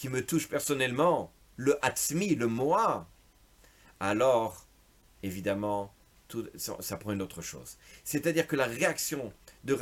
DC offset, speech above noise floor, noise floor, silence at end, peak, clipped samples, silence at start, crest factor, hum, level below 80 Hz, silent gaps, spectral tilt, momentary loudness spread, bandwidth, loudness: under 0.1%; 31 dB; -62 dBFS; 0 s; -10 dBFS; under 0.1%; 0 s; 20 dB; none; -62 dBFS; none; -4.5 dB/octave; 15 LU; 17 kHz; -30 LUFS